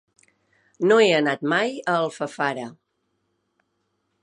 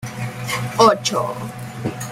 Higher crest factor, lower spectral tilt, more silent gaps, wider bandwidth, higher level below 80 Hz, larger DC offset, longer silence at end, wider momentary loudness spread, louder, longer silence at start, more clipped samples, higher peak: about the same, 18 dB vs 18 dB; about the same, -4.5 dB/octave vs -4.5 dB/octave; neither; second, 10.5 kHz vs 16 kHz; second, -78 dBFS vs -52 dBFS; neither; first, 1.5 s vs 0 s; second, 11 LU vs 15 LU; about the same, -21 LUFS vs -20 LUFS; first, 0.8 s vs 0 s; neither; second, -6 dBFS vs -2 dBFS